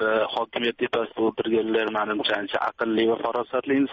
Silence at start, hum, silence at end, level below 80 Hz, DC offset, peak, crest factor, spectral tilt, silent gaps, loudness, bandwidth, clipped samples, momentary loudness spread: 0 s; none; 0 s; -66 dBFS; under 0.1%; -10 dBFS; 14 dB; -2 dB/octave; none; -25 LUFS; 6.8 kHz; under 0.1%; 4 LU